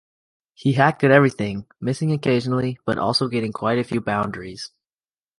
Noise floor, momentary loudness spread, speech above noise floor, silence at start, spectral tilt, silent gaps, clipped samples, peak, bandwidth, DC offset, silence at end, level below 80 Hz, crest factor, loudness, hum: under -90 dBFS; 13 LU; over 69 dB; 0.6 s; -6.5 dB/octave; none; under 0.1%; -2 dBFS; 11.5 kHz; under 0.1%; 0.7 s; -56 dBFS; 20 dB; -21 LUFS; none